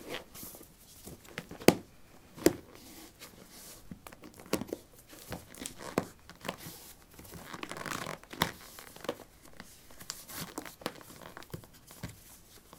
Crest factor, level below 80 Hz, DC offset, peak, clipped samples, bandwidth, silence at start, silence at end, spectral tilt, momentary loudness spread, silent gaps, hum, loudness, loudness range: 38 dB; -62 dBFS; under 0.1%; 0 dBFS; under 0.1%; 18 kHz; 0 s; 0 s; -4 dB/octave; 21 LU; none; none; -37 LUFS; 10 LU